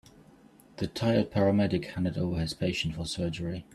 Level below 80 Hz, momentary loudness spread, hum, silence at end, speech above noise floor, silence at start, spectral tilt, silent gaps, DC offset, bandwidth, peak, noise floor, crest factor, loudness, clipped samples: -52 dBFS; 8 LU; none; 0.1 s; 28 dB; 0.75 s; -6.5 dB/octave; none; under 0.1%; 13.5 kHz; -12 dBFS; -57 dBFS; 18 dB; -30 LUFS; under 0.1%